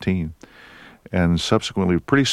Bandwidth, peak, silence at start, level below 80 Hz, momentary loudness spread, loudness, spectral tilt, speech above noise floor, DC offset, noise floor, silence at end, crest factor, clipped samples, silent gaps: 12.5 kHz; -2 dBFS; 0 s; -42 dBFS; 8 LU; -21 LUFS; -5.5 dB/octave; 26 dB; under 0.1%; -45 dBFS; 0 s; 18 dB; under 0.1%; none